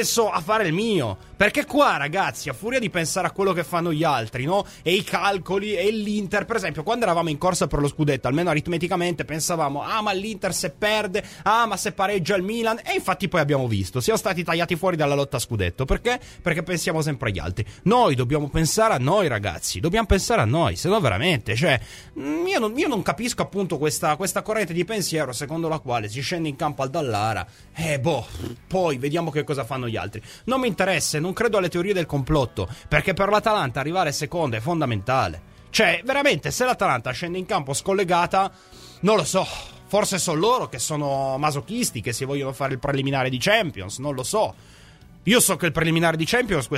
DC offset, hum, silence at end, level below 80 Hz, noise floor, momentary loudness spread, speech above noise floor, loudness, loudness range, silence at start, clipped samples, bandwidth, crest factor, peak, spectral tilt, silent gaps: under 0.1%; none; 0 s; -42 dBFS; -48 dBFS; 7 LU; 25 dB; -23 LUFS; 3 LU; 0 s; under 0.1%; 16 kHz; 22 dB; -2 dBFS; -4.5 dB/octave; none